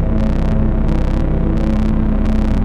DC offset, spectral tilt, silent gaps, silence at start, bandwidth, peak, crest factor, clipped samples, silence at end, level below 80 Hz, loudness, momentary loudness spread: under 0.1%; -9 dB/octave; none; 0 s; 5.6 kHz; -4 dBFS; 10 dB; under 0.1%; 0 s; -16 dBFS; -17 LUFS; 1 LU